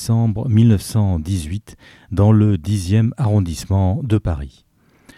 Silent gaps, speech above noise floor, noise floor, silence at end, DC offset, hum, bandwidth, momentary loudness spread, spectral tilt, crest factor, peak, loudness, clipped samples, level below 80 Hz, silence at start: none; 34 dB; -50 dBFS; 0.7 s; under 0.1%; none; 13 kHz; 12 LU; -7.5 dB/octave; 14 dB; -4 dBFS; -17 LUFS; under 0.1%; -38 dBFS; 0 s